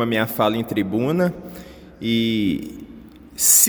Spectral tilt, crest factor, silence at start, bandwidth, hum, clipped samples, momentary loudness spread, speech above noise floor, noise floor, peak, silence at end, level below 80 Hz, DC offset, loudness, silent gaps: -3 dB/octave; 20 dB; 0 s; over 20 kHz; none; under 0.1%; 19 LU; 22 dB; -42 dBFS; 0 dBFS; 0 s; -52 dBFS; under 0.1%; -20 LUFS; none